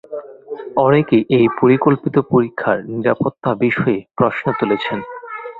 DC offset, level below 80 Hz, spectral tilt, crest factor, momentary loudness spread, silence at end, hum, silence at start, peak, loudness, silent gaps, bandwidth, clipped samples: under 0.1%; -54 dBFS; -9.5 dB/octave; 16 dB; 16 LU; 0 s; none; 0.1 s; -2 dBFS; -16 LUFS; none; 4.7 kHz; under 0.1%